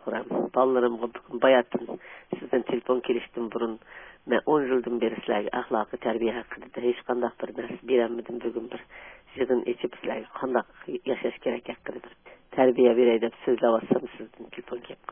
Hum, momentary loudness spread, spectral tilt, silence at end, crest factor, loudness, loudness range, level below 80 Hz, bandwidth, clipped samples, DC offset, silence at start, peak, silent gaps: none; 17 LU; -9.5 dB/octave; 0.15 s; 20 dB; -27 LUFS; 5 LU; -64 dBFS; 3.6 kHz; under 0.1%; under 0.1%; 0.05 s; -8 dBFS; none